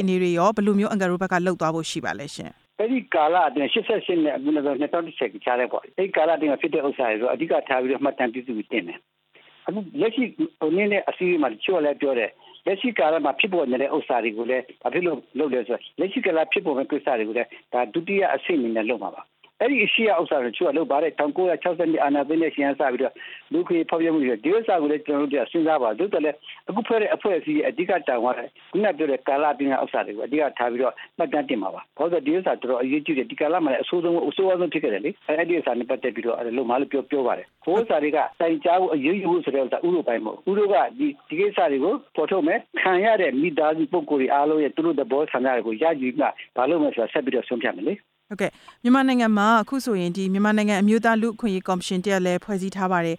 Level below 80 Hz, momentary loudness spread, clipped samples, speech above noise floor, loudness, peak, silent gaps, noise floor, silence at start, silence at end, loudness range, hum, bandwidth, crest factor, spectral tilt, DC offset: -70 dBFS; 7 LU; under 0.1%; 32 dB; -23 LUFS; -6 dBFS; none; -55 dBFS; 0 s; 0 s; 3 LU; none; 13.5 kHz; 16 dB; -6 dB/octave; under 0.1%